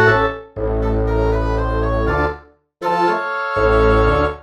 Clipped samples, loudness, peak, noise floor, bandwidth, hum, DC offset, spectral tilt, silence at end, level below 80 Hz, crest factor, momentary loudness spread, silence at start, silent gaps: under 0.1%; -18 LUFS; 0 dBFS; -39 dBFS; 7.8 kHz; none; under 0.1%; -7.5 dB/octave; 0 s; -24 dBFS; 16 dB; 9 LU; 0 s; none